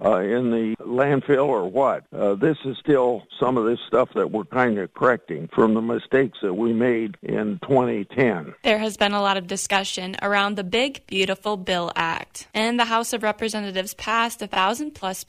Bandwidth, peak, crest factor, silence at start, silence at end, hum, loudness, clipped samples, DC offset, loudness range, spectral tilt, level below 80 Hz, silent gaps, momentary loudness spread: 15.5 kHz; -4 dBFS; 18 dB; 0 s; 0.05 s; none; -22 LUFS; under 0.1%; under 0.1%; 2 LU; -4.5 dB/octave; -60 dBFS; none; 6 LU